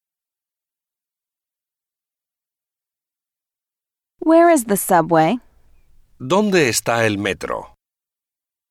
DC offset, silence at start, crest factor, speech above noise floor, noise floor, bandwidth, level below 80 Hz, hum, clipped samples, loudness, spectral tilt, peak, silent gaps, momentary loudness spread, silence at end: under 0.1%; 4.2 s; 18 dB; 73 dB; -89 dBFS; 16 kHz; -56 dBFS; none; under 0.1%; -17 LUFS; -4.5 dB/octave; -4 dBFS; none; 14 LU; 1.05 s